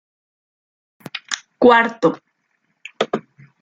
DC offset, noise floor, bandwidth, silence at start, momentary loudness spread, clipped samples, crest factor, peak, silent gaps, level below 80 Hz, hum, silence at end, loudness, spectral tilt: under 0.1%; -69 dBFS; 9.4 kHz; 1.15 s; 20 LU; under 0.1%; 20 dB; 0 dBFS; none; -66 dBFS; none; 0.4 s; -18 LUFS; -4 dB/octave